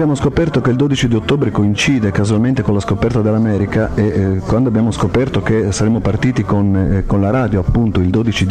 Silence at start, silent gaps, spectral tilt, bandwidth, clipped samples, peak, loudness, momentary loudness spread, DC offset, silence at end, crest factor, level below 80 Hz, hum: 0 s; none; -6.5 dB/octave; 10 kHz; under 0.1%; -4 dBFS; -15 LUFS; 2 LU; 0.5%; 0 s; 10 dB; -30 dBFS; none